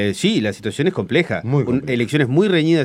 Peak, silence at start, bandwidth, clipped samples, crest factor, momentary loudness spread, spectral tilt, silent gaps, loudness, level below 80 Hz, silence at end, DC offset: -2 dBFS; 0 s; 13.5 kHz; under 0.1%; 16 dB; 5 LU; -6 dB/octave; none; -18 LUFS; -54 dBFS; 0 s; under 0.1%